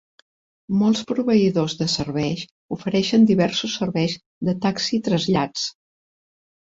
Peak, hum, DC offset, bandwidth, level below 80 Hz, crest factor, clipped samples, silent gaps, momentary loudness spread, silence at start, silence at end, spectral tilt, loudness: -6 dBFS; none; under 0.1%; 7.8 kHz; -56 dBFS; 16 dB; under 0.1%; 2.51-2.69 s, 4.26-4.41 s; 10 LU; 0.7 s; 0.95 s; -5.5 dB/octave; -21 LUFS